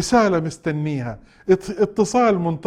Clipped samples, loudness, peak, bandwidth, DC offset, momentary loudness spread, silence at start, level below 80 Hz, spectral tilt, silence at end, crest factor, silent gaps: under 0.1%; -20 LUFS; -4 dBFS; 13 kHz; under 0.1%; 10 LU; 0 s; -48 dBFS; -6 dB/octave; 0 s; 16 dB; none